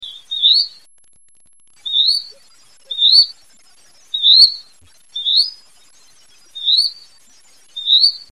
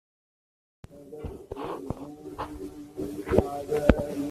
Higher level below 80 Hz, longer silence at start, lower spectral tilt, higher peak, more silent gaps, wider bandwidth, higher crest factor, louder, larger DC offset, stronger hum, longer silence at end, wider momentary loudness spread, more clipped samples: second, -68 dBFS vs -40 dBFS; second, 0 s vs 0.9 s; second, 2.5 dB/octave vs -7.5 dB/octave; about the same, 0 dBFS vs -2 dBFS; neither; about the same, 14 kHz vs 14.5 kHz; second, 18 dB vs 28 dB; first, -12 LUFS vs -30 LUFS; first, 0.4% vs under 0.1%; neither; first, 0.15 s vs 0 s; about the same, 19 LU vs 17 LU; neither